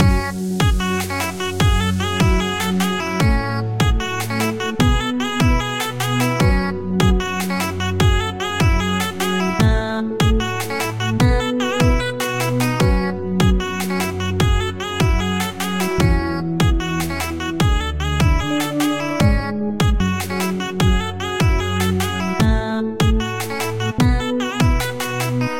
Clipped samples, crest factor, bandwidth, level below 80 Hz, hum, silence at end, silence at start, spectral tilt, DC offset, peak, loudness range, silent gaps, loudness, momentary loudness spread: under 0.1%; 16 dB; 17 kHz; -24 dBFS; none; 0 s; 0 s; -5.5 dB/octave; under 0.1%; -2 dBFS; 1 LU; none; -19 LUFS; 5 LU